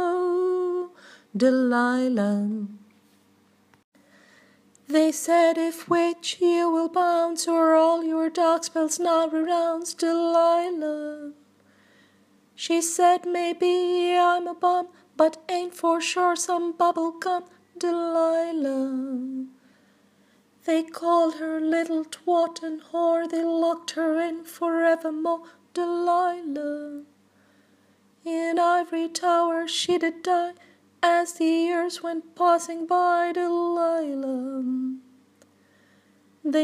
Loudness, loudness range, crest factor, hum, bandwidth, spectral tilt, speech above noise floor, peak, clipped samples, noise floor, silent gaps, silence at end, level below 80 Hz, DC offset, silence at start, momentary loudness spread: -24 LUFS; 6 LU; 20 dB; none; 15.5 kHz; -3.5 dB/octave; 38 dB; -6 dBFS; under 0.1%; -61 dBFS; 3.84-3.92 s; 0 s; -84 dBFS; under 0.1%; 0 s; 11 LU